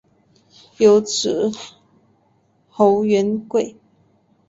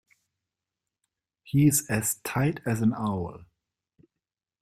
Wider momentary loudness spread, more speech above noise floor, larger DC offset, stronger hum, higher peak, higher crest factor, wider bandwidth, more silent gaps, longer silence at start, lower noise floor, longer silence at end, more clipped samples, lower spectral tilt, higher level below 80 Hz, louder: first, 18 LU vs 9 LU; second, 44 dB vs 64 dB; neither; neither; first, -2 dBFS vs -10 dBFS; about the same, 18 dB vs 20 dB; second, 8 kHz vs 16 kHz; neither; second, 0.8 s vs 1.45 s; second, -60 dBFS vs -89 dBFS; second, 0.8 s vs 1.2 s; neither; about the same, -4.5 dB/octave vs -5.5 dB/octave; about the same, -62 dBFS vs -60 dBFS; first, -18 LUFS vs -26 LUFS